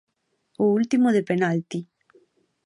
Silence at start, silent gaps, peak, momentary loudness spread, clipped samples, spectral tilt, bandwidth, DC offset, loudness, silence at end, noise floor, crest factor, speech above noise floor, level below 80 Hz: 0.6 s; none; -8 dBFS; 12 LU; under 0.1%; -7 dB/octave; 11 kHz; under 0.1%; -22 LUFS; 0.8 s; -69 dBFS; 16 dB; 47 dB; -72 dBFS